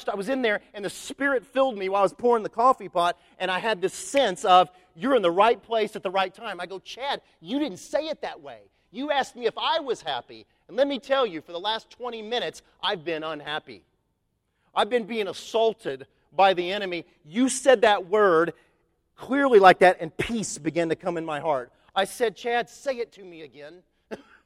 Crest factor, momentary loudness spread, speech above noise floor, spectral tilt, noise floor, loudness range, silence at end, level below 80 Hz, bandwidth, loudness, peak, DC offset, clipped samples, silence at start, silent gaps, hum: 24 dB; 15 LU; 50 dB; -3.5 dB/octave; -74 dBFS; 9 LU; 0.3 s; -62 dBFS; 14.5 kHz; -25 LUFS; -2 dBFS; under 0.1%; under 0.1%; 0 s; none; none